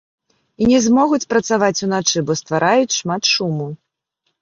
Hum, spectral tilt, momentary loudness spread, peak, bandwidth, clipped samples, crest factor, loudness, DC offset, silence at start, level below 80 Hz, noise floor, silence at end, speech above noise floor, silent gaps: none; -4 dB/octave; 6 LU; -2 dBFS; 7.6 kHz; under 0.1%; 16 dB; -16 LUFS; under 0.1%; 0.6 s; -52 dBFS; -72 dBFS; 0.65 s; 56 dB; none